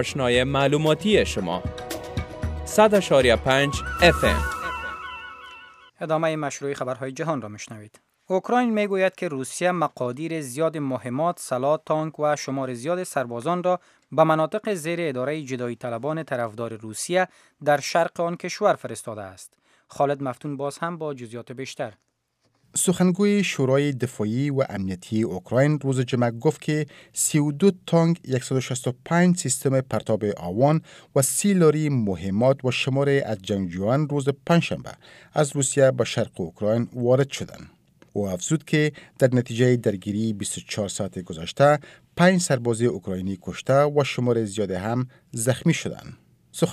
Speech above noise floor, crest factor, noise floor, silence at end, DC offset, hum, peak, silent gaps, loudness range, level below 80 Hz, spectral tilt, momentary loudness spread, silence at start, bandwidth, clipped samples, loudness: 47 dB; 20 dB; -70 dBFS; 0 s; under 0.1%; none; -4 dBFS; none; 5 LU; -46 dBFS; -5 dB/octave; 12 LU; 0 s; 15.5 kHz; under 0.1%; -23 LUFS